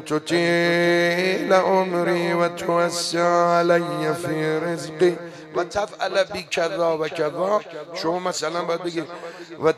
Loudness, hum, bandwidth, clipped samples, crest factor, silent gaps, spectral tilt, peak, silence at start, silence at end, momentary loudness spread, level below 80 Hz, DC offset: -22 LUFS; none; 13.5 kHz; under 0.1%; 18 dB; none; -4.5 dB/octave; -4 dBFS; 0 s; 0 s; 10 LU; -62 dBFS; under 0.1%